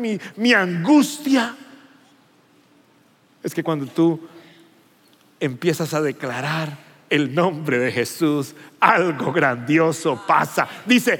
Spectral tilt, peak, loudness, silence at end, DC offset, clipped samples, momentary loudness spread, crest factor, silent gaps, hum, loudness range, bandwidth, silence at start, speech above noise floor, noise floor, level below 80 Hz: -5 dB/octave; 0 dBFS; -20 LUFS; 0 s; under 0.1%; under 0.1%; 11 LU; 20 dB; none; none; 8 LU; 17 kHz; 0 s; 37 dB; -57 dBFS; -80 dBFS